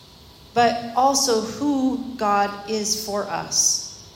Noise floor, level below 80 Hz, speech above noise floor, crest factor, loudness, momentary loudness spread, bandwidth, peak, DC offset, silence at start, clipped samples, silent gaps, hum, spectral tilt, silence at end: -47 dBFS; -56 dBFS; 25 dB; 16 dB; -21 LUFS; 7 LU; 16.5 kHz; -6 dBFS; under 0.1%; 0.2 s; under 0.1%; none; none; -2 dB/octave; 0.05 s